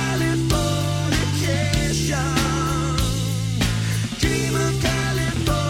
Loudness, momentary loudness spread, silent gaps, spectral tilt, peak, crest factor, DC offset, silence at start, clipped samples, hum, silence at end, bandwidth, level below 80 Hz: -21 LUFS; 2 LU; none; -4.5 dB/octave; -4 dBFS; 18 dB; under 0.1%; 0 s; under 0.1%; none; 0 s; 16.5 kHz; -32 dBFS